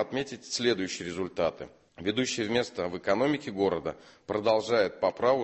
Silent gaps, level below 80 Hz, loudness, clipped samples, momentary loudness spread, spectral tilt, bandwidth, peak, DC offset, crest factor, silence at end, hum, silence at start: none; -60 dBFS; -29 LUFS; under 0.1%; 9 LU; -4 dB/octave; 8.6 kHz; -12 dBFS; under 0.1%; 18 dB; 0 s; none; 0 s